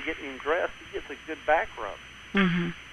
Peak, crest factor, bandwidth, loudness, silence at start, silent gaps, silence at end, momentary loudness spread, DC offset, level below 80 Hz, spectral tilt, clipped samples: -8 dBFS; 22 dB; 10.5 kHz; -29 LUFS; 0 s; none; 0 s; 13 LU; under 0.1%; -52 dBFS; -6.5 dB/octave; under 0.1%